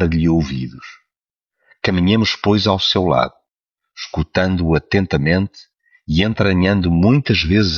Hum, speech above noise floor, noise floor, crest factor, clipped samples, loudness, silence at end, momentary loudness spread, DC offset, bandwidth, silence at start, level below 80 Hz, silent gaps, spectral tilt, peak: none; 70 dB; -86 dBFS; 16 dB; under 0.1%; -16 LUFS; 0 s; 10 LU; under 0.1%; 7 kHz; 0 s; -34 dBFS; none; -6.5 dB/octave; -2 dBFS